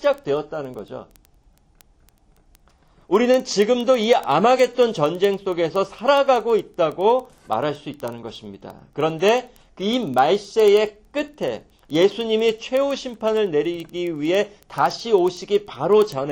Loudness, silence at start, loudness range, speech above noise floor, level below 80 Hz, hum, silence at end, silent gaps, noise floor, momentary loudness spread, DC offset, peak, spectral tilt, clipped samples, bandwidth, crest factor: -20 LUFS; 0 s; 5 LU; 36 dB; -58 dBFS; none; 0 s; none; -56 dBFS; 14 LU; under 0.1%; -4 dBFS; -5 dB/octave; under 0.1%; 17 kHz; 18 dB